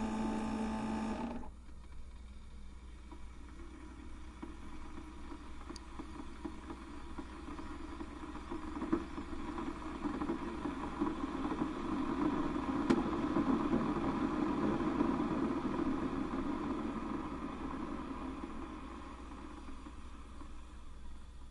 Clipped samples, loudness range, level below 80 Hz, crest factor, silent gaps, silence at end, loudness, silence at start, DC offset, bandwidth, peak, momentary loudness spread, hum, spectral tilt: under 0.1%; 16 LU; -50 dBFS; 22 dB; none; 0 s; -39 LUFS; 0 s; under 0.1%; 11.5 kHz; -16 dBFS; 19 LU; none; -7 dB/octave